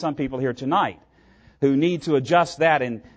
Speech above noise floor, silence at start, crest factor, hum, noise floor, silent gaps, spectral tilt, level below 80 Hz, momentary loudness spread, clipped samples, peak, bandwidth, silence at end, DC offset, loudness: 33 dB; 0 s; 16 dB; none; -54 dBFS; none; -6 dB/octave; -56 dBFS; 7 LU; under 0.1%; -6 dBFS; 9.2 kHz; 0.15 s; under 0.1%; -22 LUFS